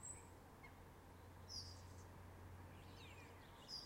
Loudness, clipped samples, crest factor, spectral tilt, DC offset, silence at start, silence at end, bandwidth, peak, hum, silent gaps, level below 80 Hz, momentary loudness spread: -58 LUFS; under 0.1%; 16 dB; -3 dB/octave; under 0.1%; 0 s; 0 s; 16 kHz; -40 dBFS; none; none; -70 dBFS; 9 LU